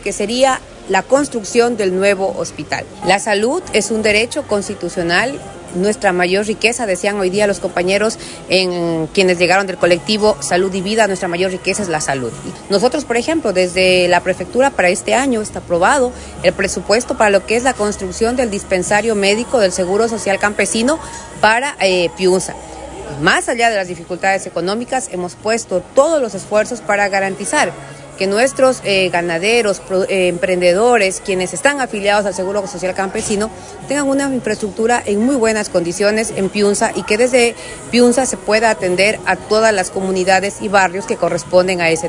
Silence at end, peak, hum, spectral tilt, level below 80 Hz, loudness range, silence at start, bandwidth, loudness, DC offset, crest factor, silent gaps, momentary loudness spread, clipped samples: 0 s; 0 dBFS; none; -3.5 dB/octave; -44 dBFS; 3 LU; 0 s; 11 kHz; -15 LUFS; under 0.1%; 16 dB; none; 7 LU; under 0.1%